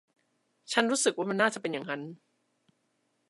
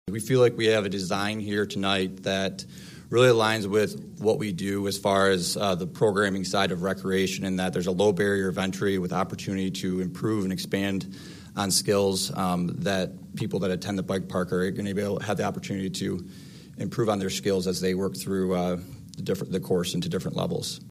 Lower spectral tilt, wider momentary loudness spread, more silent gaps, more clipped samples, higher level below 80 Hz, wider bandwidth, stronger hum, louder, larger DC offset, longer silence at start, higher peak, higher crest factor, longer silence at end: second, -2.5 dB/octave vs -5 dB/octave; about the same, 11 LU vs 9 LU; neither; neither; second, -88 dBFS vs -60 dBFS; second, 11.5 kHz vs 15.5 kHz; neither; second, -29 LUFS vs -26 LUFS; neither; first, 0.7 s vs 0.05 s; about the same, -8 dBFS vs -8 dBFS; first, 26 dB vs 18 dB; first, 1.15 s vs 0 s